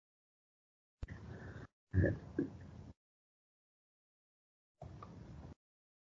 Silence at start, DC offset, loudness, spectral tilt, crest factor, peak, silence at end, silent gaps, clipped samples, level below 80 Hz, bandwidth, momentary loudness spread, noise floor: 1.05 s; under 0.1%; -42 LUFS; -9 dB/octave; 24 dB; -20 dBFS; 0.6 s; 1.73-1.87 s, 2.97-4.75 s; under 0.1%; -58 dBFS; 7 kHz; 22 LU; under -90 dBFS